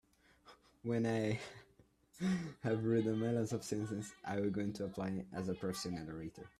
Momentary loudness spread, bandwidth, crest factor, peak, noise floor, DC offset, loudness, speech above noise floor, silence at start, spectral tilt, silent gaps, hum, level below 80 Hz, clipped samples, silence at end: 10 LU; 14 kHz; 16 dB; -22 dBFS; -69 dBFS; under 0.1%; -39 LUFS; 31 dB; 0.45 s; -6.5 dB/octave; none; none; -68 dBFS; under 0.1%; 0.1 s